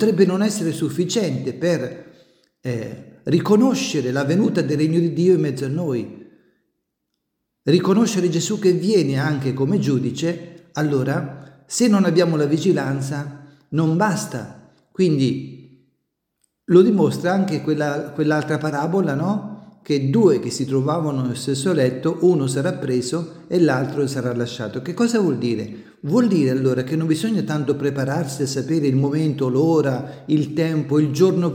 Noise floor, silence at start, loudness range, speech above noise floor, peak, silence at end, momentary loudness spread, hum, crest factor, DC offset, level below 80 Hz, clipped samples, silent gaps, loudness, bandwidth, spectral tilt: -77 dBFS; 0 s; 3 LU; 58 dB; -2 dBFS; 0 s; 11 LU; none; 18 dB; under 0.1%; -64 dBFS; under 0.1%; none; -20 LUFS; 16.5 kHz; -6.5 dB/octave